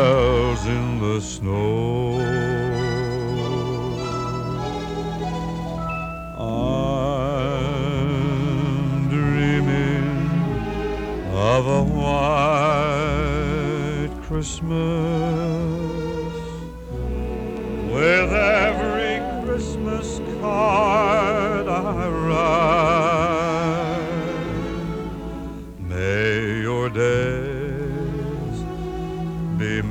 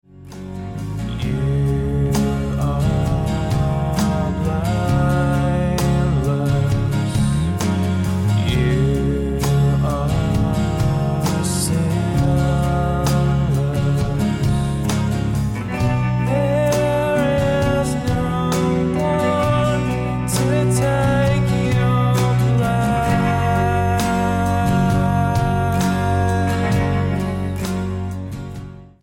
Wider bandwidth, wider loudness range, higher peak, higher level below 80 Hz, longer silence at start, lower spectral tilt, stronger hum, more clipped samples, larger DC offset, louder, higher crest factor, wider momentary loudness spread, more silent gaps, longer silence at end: second, 12 kHz vs 17 kHz; first, 5 LU vs 2 LU; about the same, -4 dBFS vs -4 dBFS; about the same, -34 dBFS vs -30 dBFS; second, 0 s vs 0.15 s; about the same, -6.5 dB/octave vs -6.5 dB/octave; neither; neither; neither; second, -22 LUFS vs -19 LUFS; about the same, 16 dB vs 14 dB; first, 10 LU vs 5 LU; neither; second, 0 s vs 0.15 s